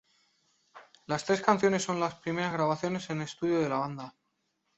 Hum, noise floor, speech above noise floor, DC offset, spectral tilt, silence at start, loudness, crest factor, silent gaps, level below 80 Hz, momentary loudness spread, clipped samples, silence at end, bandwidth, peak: none; -78 dBFS; 49 dB; under 0.1%; -5 dB/octave; 0.75 s; -30 LUFS; 24 dB; none; -70 dBFS; 10 LU; under 0.1%; 0.7 s; 8.2 kHz; -8 dBFS